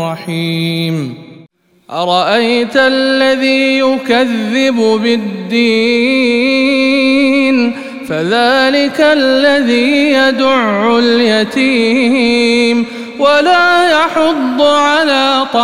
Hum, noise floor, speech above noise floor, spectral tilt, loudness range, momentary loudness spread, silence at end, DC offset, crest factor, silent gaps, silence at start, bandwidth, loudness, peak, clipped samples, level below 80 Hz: none; -44 dBFS; 33 dB; -4.5 dB/octave; 2 LU; 7 LU; 0 s; 0.5%; 10 dB; none; 0 s; 14.5 kHz; -11 LUFS; 0 dBFS; under 0.1%; -54 dBFS